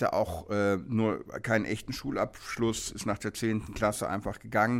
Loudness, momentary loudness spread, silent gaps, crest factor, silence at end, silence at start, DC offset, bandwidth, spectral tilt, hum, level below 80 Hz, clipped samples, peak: -31 LUFS; 5 LU; none; 18 dB; 0 s; 0 s; under 0.1%; 16 kHz; -5 dB/octave; none; -52 dBFS; under 0.1%; -12 dBFS